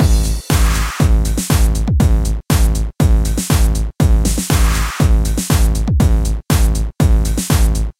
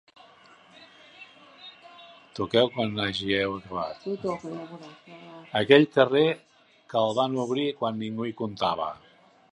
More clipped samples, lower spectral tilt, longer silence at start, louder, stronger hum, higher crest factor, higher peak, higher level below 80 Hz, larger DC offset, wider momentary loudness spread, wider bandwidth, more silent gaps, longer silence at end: neither; about the same, -5 dB/octave vs -6 dB/octave; second, 0 s vs 0.8 s; first, -15 LUFS vs -26 LUFS; neither; second, 10 dB vs 26 dB; about the same, -2 dBFS vs -2 dBFS; first, -14 dBFS vs -64 dBFS; first, 0.5% vs under 0.1%; second, 2 LU vs 25 LU; first, 16.5 kHz vs 10.5 kHz; neither; second, 0.1 s vs 0.6 s